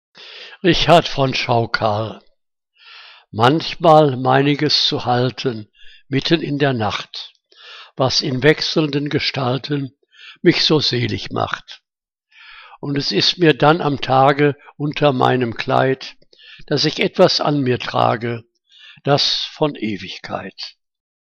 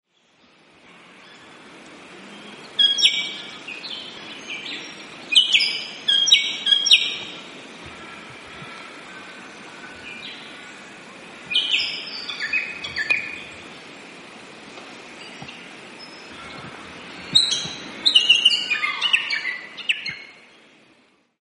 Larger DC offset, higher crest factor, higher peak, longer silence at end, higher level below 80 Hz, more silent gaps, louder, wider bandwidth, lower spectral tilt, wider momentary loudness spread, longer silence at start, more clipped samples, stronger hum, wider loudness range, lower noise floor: neither; second, 18 dB vs 24 dB; about the same, 0 dBFS vs 0 dBFS; second, 0.7 s vs 1.1 s; first, -44 dBFS vs -66 dBFS; neither; about the same, -17 LUFS vs -18 LUFS; second, 9.4 kHz vs 11.5 kHz; first, -5.5 dB/octave vs 0.5 dB/octave; second, 15 LU vs 25 LU; second, 0.2 s vs 1.2 s; neither; neither; second, 4 LU vs 19 LU; first, -83 dBFS vs -59 dBFS